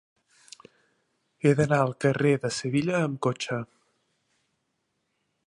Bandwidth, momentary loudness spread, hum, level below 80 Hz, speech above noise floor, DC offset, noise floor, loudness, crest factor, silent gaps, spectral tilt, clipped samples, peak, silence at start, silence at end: 11.5 kHz; 9 LU; none; -64 dBFS; 52 dB; under 0.1%; -77 dBFS; -26 LUFS; 20 dB; none; -6 dB/octave; under 0.1%; -8 dBFS; 1.45 s; 1.8 s